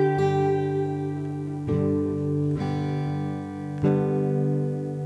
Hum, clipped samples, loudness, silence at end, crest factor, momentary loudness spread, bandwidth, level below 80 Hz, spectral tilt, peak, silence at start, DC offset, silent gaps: none; under 0.1%; -26 LUFS; 0 s; 16 dB; 8 LU; 8 kHz; -56 dBFS; -9 dB/octave; -10 dBFS; 0 s; under 0.1%; none